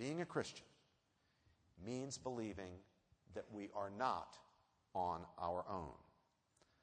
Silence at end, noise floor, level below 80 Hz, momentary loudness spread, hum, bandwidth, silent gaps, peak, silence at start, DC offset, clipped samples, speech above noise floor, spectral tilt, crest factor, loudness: 0.8 s; -81 dBFS; -72 dBFS; 15 LU; none; 9.6 kHz; none; -26 dBFS; 0 s; under 0.1%; under 0.1%; 35 dB; -5 dB/octave; 22 dB; -47 LUFS